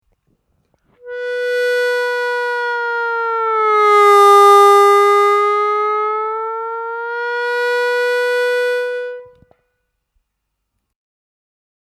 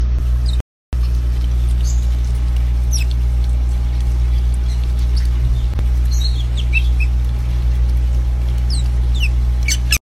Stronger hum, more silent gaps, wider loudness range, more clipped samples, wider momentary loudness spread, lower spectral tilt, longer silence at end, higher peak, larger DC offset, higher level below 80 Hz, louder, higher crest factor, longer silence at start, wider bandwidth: second, none vs 60 Hz at -20 dBFS; second, none vs 0.61-0.92 s; first, 11 LU vs 1 LU; neither; first, 15 LU vs 2 LU; second, -0.5 dB/octave vs -4.5 dB/octave; first, 2.7 s vs 0.05 s; about the same, 0 dBFS vs -2 dBFS; neither; second, -72 dBFS vs -16 dBFS; first, -14 LUFS vs -18 LUFS; about the same, 16 dB vs 14 dB; first, 1.05 s vs 0 s; first, 14.5 kHz vs 13 kHz